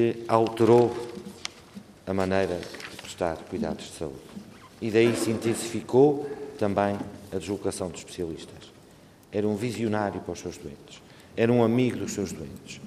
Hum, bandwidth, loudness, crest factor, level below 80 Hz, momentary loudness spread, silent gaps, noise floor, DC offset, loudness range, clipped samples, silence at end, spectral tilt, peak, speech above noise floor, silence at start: none; 14.5 kHz; -27 LUFS; 22 dB; -62 dBFS; 21 LU; none; -53 dBFS; under 0.1%; 6 LU; under 0.1%; 0 s; -6 dB/octave; -6 dBFS; 27 dB; 0 s